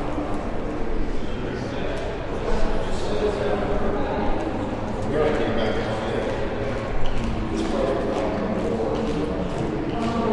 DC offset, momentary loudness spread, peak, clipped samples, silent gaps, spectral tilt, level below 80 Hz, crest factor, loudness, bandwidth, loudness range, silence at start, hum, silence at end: under 0.1%; 6 LU; -8 dBFS; under 0.1%; none; -6.5 dB/octave; -30 dBFS; 14 dB; -26 LUFS; 10.5 kHz; 2 LU; 0 s; none; 0 s